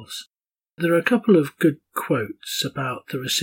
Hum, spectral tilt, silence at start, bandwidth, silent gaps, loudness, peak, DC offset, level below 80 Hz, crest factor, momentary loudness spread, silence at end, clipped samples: none; -4.5 dB/octave; 0 s; 17 kHz; none; -22 LUFS; -6 dBFS; under 0.1%; -72 dBFS; 18 dB; 12 LU; 0 s; under 0.1%